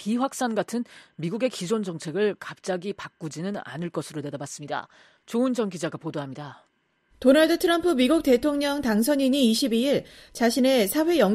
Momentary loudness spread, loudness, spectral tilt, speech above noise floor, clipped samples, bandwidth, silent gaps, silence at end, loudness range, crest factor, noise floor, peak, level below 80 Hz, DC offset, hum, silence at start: 14 LU; -25 LUFS; -4.5 dB/octave; 41 dB; under 0.1%; 14.5 kHz; none; 0 s; 9 LU; 18 dB; -65 dBFS; -6 dBFS; -58 dBFS; under 0.1%; none; 0 s